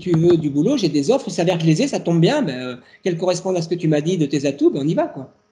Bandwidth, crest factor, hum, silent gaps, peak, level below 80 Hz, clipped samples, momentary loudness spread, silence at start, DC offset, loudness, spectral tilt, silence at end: 10.5 kHz; 14 dB; none; none; -4 dBFS; -60 dBFS; under 0.1%; 9 LU; 0 s; under 0.1%; -19 LUFS; -6.5 dB/octave; 0.25 s